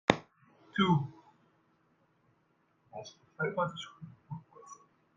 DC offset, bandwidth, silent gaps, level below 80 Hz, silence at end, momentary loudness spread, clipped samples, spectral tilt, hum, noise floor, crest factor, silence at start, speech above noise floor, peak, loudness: under 0.1%; 7.6 kHz; none; -68 dBFS; 0.45 s; 24 LU; under 0.1%; -6 dB/octave; none; -73 dBFS; 34 dB; 0.1 s; 41 dB; -2 dBFS; -33 LUFS